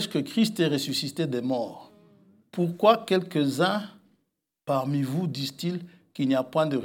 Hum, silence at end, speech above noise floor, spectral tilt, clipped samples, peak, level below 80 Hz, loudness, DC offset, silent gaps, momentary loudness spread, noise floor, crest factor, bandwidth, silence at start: none; 0 s; 52 dB; -5.5 dB/octave; under 0.1%; -6 dBFS; -80 dBFS; -26 LUFS; under 0.1%; none; 12 LU; -78 dBFS; 22 dB; 17.5 kHz; 0 s